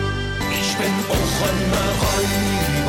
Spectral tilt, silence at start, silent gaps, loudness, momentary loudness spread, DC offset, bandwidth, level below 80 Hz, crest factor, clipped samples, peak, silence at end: -4 dB/octave; 0 s; none; -20 LUFS; 3 LU; under 0.1%; 17 kHz; -30 dBFS; 12 dB; under 0.1%; -8 dBFS; 0 s